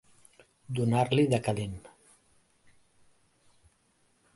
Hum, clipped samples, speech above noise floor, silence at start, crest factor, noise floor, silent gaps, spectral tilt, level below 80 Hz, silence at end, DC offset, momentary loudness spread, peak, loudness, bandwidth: none; under 0.1%; 42 dB; 0.7 s; 22 dB; -70 dBFS; none; -6.5 dB/octave; -60 dBFS; 2.5 s; under 0.1%; 14 LU; -12 dBFS; -29 LUFS; 11.5 kHz